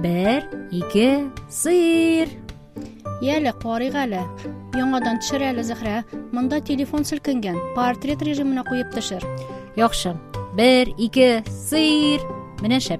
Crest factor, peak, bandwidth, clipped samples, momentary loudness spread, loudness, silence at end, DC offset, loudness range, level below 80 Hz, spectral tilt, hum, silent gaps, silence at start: 18 dB; -4 dBFS; 15.5 kHz; under 0.1%; 13 LU; -21 LUFS; 0 s; under 0.1%; 5 LU; -44 dBFS; -4.5 dB/octave; none; none; 0 s